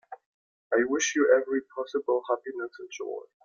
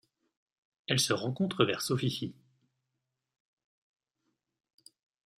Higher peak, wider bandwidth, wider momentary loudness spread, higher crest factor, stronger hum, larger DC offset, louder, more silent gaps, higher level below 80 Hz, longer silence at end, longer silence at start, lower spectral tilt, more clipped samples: first, -8 dBFS vs -12 dBFS; second, 7.6 kHz vs 15.5 kHz; first, 15 LU vs 12 LU; about the same, 20 dB vs 24 dB; neither; neither; first, -28 LUFS vs -31 LUFS; first, 0.26-0.70 s vs none; about the same, -74 dBFS vs -74 dBFS; second, 0.25 s vs 3.05 s; second, 0.1 s vs 0.9 s; second, -1.5 dB/octave vs -4 dB/octave; neither